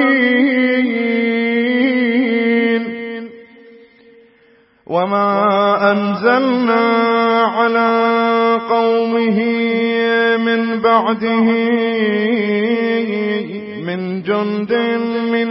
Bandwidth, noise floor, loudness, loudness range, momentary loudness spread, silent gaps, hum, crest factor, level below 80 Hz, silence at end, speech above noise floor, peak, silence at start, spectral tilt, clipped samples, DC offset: 5.8 kHz; -52 dBFS; -15 LUFS; 5 LU; 6 LU; none; none; 14 dB; -66 dBFS; 0 s; 37 dB; 0 dBFS; 0 s; -10.5 dB/octave; under 0.1%; under 0.1%